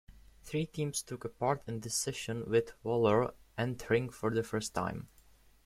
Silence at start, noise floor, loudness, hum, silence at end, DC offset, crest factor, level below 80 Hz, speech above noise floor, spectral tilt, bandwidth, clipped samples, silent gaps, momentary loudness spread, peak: 0.1 s; -62 dBFS; -34 LUFS; none; 0.6 s; under 0.1%; 20 dB; -60 dBFS; 29 dB; -5 dB/octave; 15.5 kHz; under 0.1%; none; 9 LU; -14 dBFS